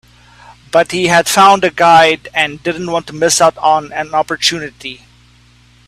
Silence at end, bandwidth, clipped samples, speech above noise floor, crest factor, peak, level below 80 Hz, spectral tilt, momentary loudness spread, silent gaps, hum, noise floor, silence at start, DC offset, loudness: 0.95 s; 16 kHz; under 0.1%; 34 dB; 14 dB; 0 dBFS; -50 dBFS; -2.5 dB/octave; 12 LU; none; 60 Hz at -45 dBFS; -46 dBFS; 0.75 s; under 0.1%; -11 LUFS